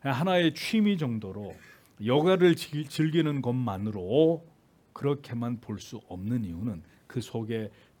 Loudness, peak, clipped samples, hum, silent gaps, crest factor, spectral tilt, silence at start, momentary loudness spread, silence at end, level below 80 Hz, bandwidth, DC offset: -28 LUFS; -10 dBFS; under 0.1%; none; none; 18 dB; -6.5 dB/octave; 0.05 s; 15 LU; 0.3 s; -66 dBFS; 18 kHz; under 0.1%